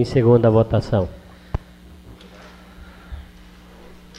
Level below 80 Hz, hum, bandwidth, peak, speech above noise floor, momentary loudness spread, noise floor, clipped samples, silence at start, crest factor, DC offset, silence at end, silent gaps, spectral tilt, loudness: -40 dBFS; 60 Hz at -45 dBFS; 9 kHz; -4 dBFS; 28 dB; 25 LU; -44 dBFS; under 0.1%; 0 s; 18 dB; under 0.1%; 1 s; none; -9 dB/octave; -19 LUFS